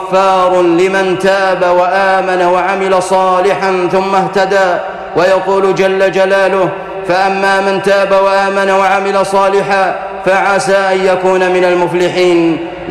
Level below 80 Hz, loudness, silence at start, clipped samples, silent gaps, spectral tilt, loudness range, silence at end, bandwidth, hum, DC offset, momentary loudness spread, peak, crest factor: -46 dBFS; -11 LUFS; 0 s; under 0.1%; none; -5 dB/octave; 1 LU; 0 s; 12.5 kHz; none; under 0.1%; 3 LU; -2 dBFS; 8 dB